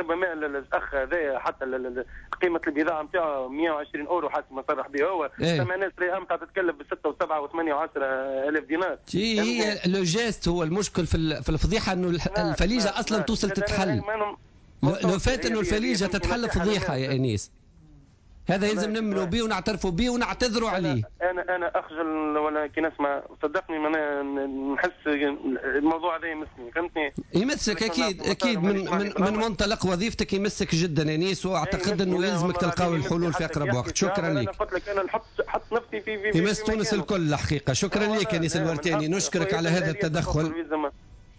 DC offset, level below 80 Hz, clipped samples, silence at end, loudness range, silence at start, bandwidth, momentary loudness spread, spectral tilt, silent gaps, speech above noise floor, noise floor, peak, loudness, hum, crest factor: under 0.1%; -42 dBFS; under 0.1%; 0.05 s; 2 LU; 0 s; 8 kHz; 5 LU; -5 dB/octave; none; 27 dB; -53 dBFS; -12 dBFS; -26 LUFS; none; 14 dB